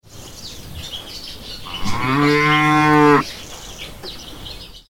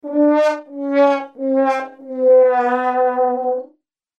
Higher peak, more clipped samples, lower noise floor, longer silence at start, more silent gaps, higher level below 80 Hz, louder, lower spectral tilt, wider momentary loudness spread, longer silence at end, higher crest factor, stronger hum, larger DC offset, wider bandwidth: first, 0 dBFS vs -4 dBFS; neither; second, -36 dBFS vs -56 dBFS; about the same, 0.1 s vs 0.05 s; neither; first, -40 dBFS vs -86 dBFS; about the same, -15 LUFS vs -17 LUFS; about the same, -5 dB/octave vs -4.5 dB/octave; first, 21 LU vs 11 LU; second, 0.1 s vs 0.55 s; first, 20 dB vs 12 dB; neither; first, 0.4% vs under 0.1%; first, 17 kHz vs 7.8 kHz